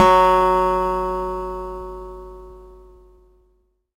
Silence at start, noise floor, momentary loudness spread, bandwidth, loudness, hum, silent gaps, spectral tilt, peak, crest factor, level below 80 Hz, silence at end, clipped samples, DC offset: 0 s; -63 dBFS; 24 LU; 16 kHz; -19 LUFS; none; none; -5.5 dB/octave; 0 dBFS; 20 dB; -38 dBFS; 1.25 s; under 0.1%; under 0.1%